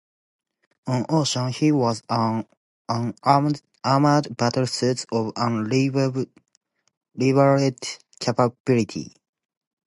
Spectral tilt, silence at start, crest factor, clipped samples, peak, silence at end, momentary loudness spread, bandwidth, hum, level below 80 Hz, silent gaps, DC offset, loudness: -6 dB/octave; 0.85 s; 20 dB; under 0.1%; -2 dBFS; 0.8 s; 12 LU; 11.5 kHz; none; -64 dBFS; 2.57-2.85 s, 6.57-6.61 s, 6.97-7.01 s, 8.60-8.65 s; under 0.1%; -22 LUFS